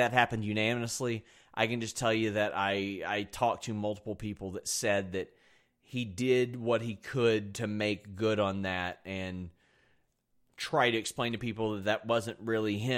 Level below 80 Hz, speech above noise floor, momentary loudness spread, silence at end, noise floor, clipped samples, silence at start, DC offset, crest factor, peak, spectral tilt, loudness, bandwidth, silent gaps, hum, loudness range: -64 dBFS; 42 dB; 10 LU; 0 s; -73 dBFS; under 0.1%; 0 s; under 0.1%; 24 dB; -8 dBFS; -4.5 dB/octave; -32 LUFS; 16.5 kHz; none; none; 3 LU